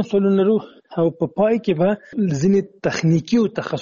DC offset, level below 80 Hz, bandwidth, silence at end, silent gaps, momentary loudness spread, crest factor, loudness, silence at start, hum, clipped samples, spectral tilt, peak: under 0.1%; -56 dBFS; 7.2 kHz; 0 s; none; 5 LU; 12 dB; -19 LUFS; 0 s; none; under 0.1%; -7 dB/octave; -8 dBFS